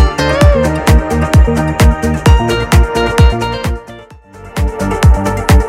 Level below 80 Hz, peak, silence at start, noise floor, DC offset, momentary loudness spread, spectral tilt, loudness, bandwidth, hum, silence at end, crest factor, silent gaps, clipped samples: -14 dBFS; 0 dBFS; 0 s; -34 dBFS; under 0.1%; 9 LU; -6 dB/octave; -11 LUFS; 16 kHz; none; 0 s; 10 dB; none; under 0.1%